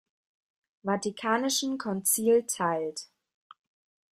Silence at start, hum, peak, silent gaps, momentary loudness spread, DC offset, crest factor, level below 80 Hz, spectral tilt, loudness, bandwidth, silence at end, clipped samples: 0.85 s; none; -12 dBFS; none; 11 LU; under 0.1%; 18 dB; -74 dBFS; -3 dB/octave; -28 LUFS; 15.5 kHz; 1.05 s; under 0.1%